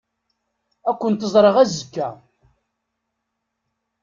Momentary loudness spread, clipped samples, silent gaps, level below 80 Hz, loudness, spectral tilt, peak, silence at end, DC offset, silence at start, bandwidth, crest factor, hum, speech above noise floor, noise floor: 14 LU; under 0.1%; none; -62 dBFS; -19 LUFS; -5.5 dB/octave; -2 dBFS; 1.9 s; under 0.1%; 0.85 s; 7.6 kHz; 20 dB; none; 60 dB; -78 dBFS